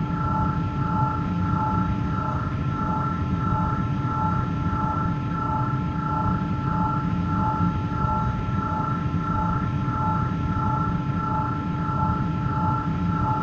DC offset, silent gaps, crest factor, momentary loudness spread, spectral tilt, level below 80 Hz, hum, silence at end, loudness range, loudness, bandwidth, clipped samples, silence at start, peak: under 0.1%; none; 14 dB; 2 LU; -9 dB/octave; -38 dBFS; none; 0 s; 0 LU; -25 LUFS; 7 kHz; under 0.1%; 0 s; -10 dBFS